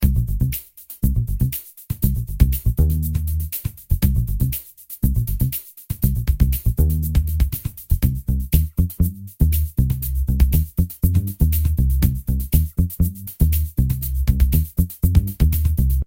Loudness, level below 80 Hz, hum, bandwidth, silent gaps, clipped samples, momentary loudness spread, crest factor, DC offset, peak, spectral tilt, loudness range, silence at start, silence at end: -21 LUFS; -22 dBFS; none; 17 kHz; none; under 0.1%; 6 LU; 18 dB; under 0.1%; 0 dBFS; -7 dB/octave; 2 LU; 0 s; 0.05 s